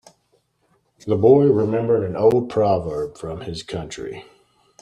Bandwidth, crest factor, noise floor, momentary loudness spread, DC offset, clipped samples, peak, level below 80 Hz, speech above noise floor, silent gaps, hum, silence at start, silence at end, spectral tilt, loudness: 10.5 kHz; 18 dB; -65 dBFS; 17 LU; under 0.1%; under 0.1%; -2 dBFS; -52 dBFS; 46 dB; none; none; 1.05 s; 0.6 s; -7.5 dB/octave; -19 LUFS